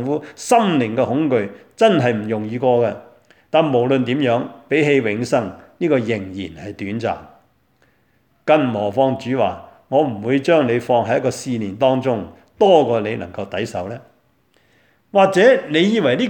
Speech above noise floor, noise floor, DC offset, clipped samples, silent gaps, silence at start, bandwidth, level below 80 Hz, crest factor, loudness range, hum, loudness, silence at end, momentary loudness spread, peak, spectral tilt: 44 dB; -61 dBFS; under 0.1%; under 0.1%; none; 0 s; 18 kHz; -60 dBFS; 18 dB; 4 LU; none; -18 LUFS; 0 s; 13 LU; 0 dBFS; -6 dB/octave